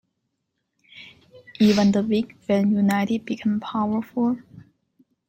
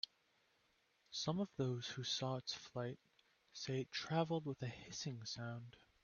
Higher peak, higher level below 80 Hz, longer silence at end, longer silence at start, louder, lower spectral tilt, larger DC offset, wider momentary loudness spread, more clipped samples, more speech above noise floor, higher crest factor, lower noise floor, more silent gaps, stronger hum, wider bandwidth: first, -6 dBFS vs -24 dBFS; first, -62 dBFS vs -78 dBFS; first, 0.7 s vs 0.25 s; second, 0.95 s vs 1.1 s; first, -22 LUFS vs -44 LUFS; first, -6.5 dB/octave vs -4.5 dB/octave; neither; second, 7 LU vs 10 LU; neither; first, 56 dB vs 35 dB; second, 16 dB vs 22 dB; about the same, -77 dBFS vs -79 dBFS; neither; neither; first, 14.5 kHz vs 7 kHz